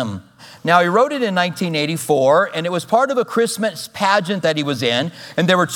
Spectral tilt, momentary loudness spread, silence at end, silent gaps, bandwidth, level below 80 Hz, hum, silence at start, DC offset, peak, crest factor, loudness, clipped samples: -4.5 dB/octave; 8 LU; 0 s; none; 19 kHz; -66 dBFS; none; 0 s; under 0.1%; 0 dBFS; 18 dB; -17 LUFS; under 0.1%